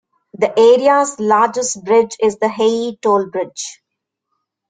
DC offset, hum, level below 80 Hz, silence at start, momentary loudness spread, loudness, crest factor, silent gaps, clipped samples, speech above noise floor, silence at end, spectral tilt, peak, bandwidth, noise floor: under 0.1%; none; -62 dBFS; 0.4 s; 12 LU; -15 LUFS; 14 dB; none; under 0.1%; 64 dB; 0.95 s; -3.5 dB/octave; -2 dBFS; 9.4 kHz; -78 dBFS